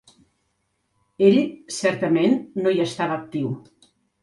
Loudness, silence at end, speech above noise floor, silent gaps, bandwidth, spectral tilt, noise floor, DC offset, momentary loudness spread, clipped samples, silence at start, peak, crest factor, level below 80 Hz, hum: -22 LUFS; 0.65 s; 51 dB; none; 11.5 kHz; -6 dB/octave; -72 dBFS; under 0.1%; 11 LU; under 0.1%; 1.2 s; -4 dBFS; 20 dB; -66 dBFS; none